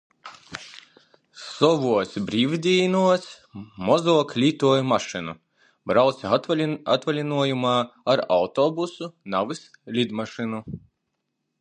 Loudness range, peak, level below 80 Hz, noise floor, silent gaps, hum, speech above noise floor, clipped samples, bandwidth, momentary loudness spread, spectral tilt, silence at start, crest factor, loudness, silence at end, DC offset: 4 LU; -4 dBFS; -62 dBFS; -78 dBFS; none; none; 55 dB; under 0.1%; 9.8 kHz; 19 LU; -5.5 dB/octave; 0.25 s; 20 dB; -23 LUFS; 0.85 s; under 0.1%